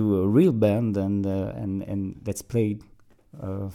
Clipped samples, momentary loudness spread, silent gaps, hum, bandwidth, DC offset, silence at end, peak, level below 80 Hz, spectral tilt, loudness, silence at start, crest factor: under 0.1%; 14 LU; none; none; 16 kHz; under 0.1%; 0 s; -8 dBFS; -54 dBFS; -8 dB/octave; -25 LUFS; 0 s; 16 dB